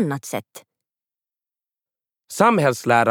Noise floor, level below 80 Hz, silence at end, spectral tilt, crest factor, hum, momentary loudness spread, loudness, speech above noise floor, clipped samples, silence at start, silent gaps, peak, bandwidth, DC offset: under -90 dBFS; -70 dBFS; 0 s; -5.5 dB/octave; 22 dB; none; 15 LU; -19 LUFS; over 71 dB; under 0.1%; 0 s; none; -2 dBFS; 19 kHz; under 0.1%